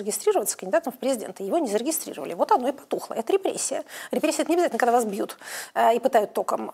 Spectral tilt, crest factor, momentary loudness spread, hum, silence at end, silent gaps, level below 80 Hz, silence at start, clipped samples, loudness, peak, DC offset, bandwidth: -3 dB/octave; 18 dB; 9 LU; none; 0 s; none; -78 dBFS; 0 s; under 0.1%; -25 LUFS; -6 dBFS; under 0.1%; 16 kHz